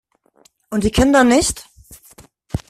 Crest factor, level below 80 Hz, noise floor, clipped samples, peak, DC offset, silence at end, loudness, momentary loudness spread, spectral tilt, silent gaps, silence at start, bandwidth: 18 dB; -34 dBFS; -56 dBFS; under 0.1%; 0 dBFS; under 0.1%; 0.1 s; -15 LUFS; 17 LU; -4.5 dB/octave; none; 0.7 s; 14.5 kHz